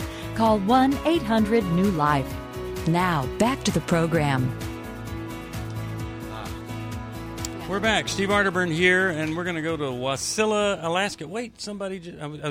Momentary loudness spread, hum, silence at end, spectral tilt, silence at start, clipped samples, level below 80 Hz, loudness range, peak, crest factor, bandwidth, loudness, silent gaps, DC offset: 14 LU; none; 0 s; -5 dB/octave; 0 s; under 0.1%; -44 dBFS; 7 LU; -6 dBFS; 18 dB; 16 kHz; -24 LUFS; none; under 0.1%